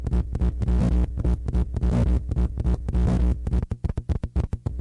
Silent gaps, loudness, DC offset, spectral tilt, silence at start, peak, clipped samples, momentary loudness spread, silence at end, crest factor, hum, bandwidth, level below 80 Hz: none; -25 LUFS; under 0.1%; -9 dB/octave; 0 s; -12 dBFS; under 0.1%; 6 LU; 0 s; 12 dB; none; 5.8 kHz; -24 dBFS